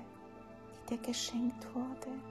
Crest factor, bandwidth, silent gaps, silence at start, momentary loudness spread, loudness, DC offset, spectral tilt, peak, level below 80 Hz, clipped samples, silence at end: 16 dB; 14 kHz; none; 0 s; 17 LU; -39 LUFS; under 0.1%; -3.5 dB/octave; -24 dBFS; -68 dBFS; under 0.1%; 0 s